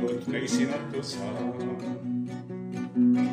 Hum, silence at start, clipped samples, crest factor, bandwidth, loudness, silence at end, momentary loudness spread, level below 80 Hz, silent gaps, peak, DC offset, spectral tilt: none; 0 s; under 0.1%; 14 dB; 10.5 kHz; -30 LUFS; 0 s; 10 LU; -74 dBFS; none; -14 dBFS; under 0.1%; -5.5 dB/octave